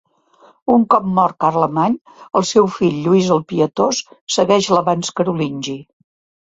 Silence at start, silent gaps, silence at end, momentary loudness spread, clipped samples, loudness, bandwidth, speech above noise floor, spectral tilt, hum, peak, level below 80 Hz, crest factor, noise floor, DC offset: 0.65 s; 2.01-2.05 s, 4.21-4.27 s; 0.65 s; 9 LU; under 0.1%; -16 LUFS; 8 kHz; 35 dB; -5.5 dB/octave; none; 0 dBFS; -56 dBFS; 16 dB; -51 dBFS; under 0.1%